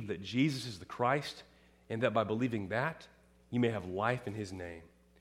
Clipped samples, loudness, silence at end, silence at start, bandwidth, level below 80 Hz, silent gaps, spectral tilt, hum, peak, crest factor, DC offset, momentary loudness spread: under 0.1%; -35 LUFS; 0.35 s; 0 s; 15 kHz; -68 dBFS; none; -6 dB/octave; none; -16 dBFS; 20 dB; under 0.1%; 13 LU